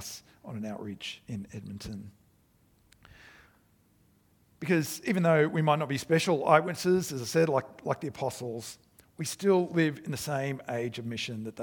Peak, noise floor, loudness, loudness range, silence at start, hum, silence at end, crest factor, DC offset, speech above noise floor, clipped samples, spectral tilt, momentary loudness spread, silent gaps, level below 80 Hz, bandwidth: -6 dBFS; -66 dBFS; -29 LUFS; 17 LU; 0 s; none; 0 s; 24 dB; under 0.1%; 36 dB; under 0.1%; -5.5 dB/octave; 17 LU; none; -66 dBFS; 19 kHz